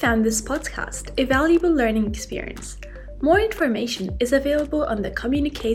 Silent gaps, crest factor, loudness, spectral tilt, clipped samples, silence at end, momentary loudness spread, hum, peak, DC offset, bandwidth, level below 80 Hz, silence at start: none; 16 dB; -22 LUFS; -4.5 dB/octave; under 0.1%; 0 s; 13 LU; none; -6 dBFS; under 0.1%; 16 kHz; -36 dBFS; 0 s